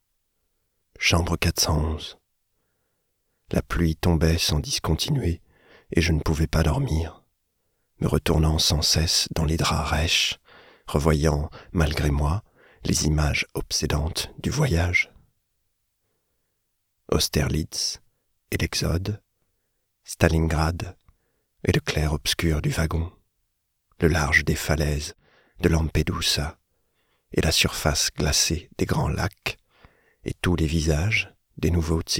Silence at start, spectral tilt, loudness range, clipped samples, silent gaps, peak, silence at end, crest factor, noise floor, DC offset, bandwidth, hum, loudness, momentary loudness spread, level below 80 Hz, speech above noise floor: 1 s; -4 dB/octave; 5 LU; under 0.1%; none; 0 dBFS; 0 s; 24 dB; -75 dBFS; under 0.1%; 17 kHz; none; -24 LUFS; 10 LU; -34 dBFS; 52 dB